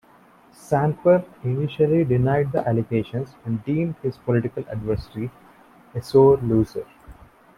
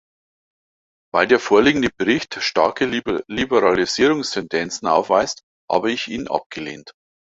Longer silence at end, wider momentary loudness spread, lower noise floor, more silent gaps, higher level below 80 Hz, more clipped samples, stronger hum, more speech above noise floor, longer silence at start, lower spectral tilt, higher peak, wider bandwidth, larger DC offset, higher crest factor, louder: about the same, 0.45 s vs 0.45 s; first, 16 LU vs 10 LU; second, -53 dBFS vs under -90 dBFS; second, none vs 5.43-5.68 s, 6.46-6.50 s; about the same, -48 dBFS vs -52 dBFS; neither; neither; second, 32 dB vs over 71 dB; second, 0.7 s vs 1.15 s; first, -9 dB/octave vs -4 dB/octave; about the same, -4 dBFS vs -2 dBFS; first, 13 kHz vs 8 kHz; neither; about the same, 18 dB vs 20 dB; second, -22 LUFS vs -19 LUFS